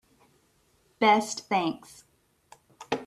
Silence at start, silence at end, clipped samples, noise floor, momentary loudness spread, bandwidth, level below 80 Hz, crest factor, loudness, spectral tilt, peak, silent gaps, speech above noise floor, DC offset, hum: 1 s; 0 s; under 0.1%; -67 dBFS; 12 LU; 14 kHz; -72 dBFS; 22 dB; -26 LUFS; -3.5 dB/octave; -8 dBFS; none; 41 dB; under 0.1%; none